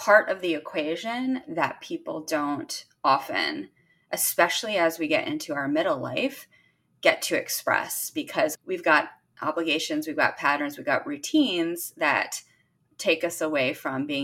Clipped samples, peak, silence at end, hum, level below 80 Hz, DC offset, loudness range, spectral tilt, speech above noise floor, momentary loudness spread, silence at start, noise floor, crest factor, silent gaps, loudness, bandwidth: under 0.1%; -4 dBFS; 0 s; none; -74 dBFS; under 0.1%; 2 LU; -2.5 dB/octave; 40 dB; 9 LU; 0 s; -66 dBFS; 22 dB; none; -26 LUFS; 17 kHz